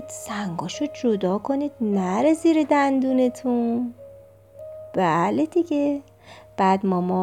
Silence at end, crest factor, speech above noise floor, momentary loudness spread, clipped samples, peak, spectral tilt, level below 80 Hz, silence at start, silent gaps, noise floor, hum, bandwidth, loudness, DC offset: 0 s; 16 dB; 26 dB; 12 LU; under 0.1%; -6 dBFS; -6.5 dB/octave; -64 dBFS; 0 s; none; -47 dBFS; none; 13.5 kHz; -22 LUFS; under 0.1%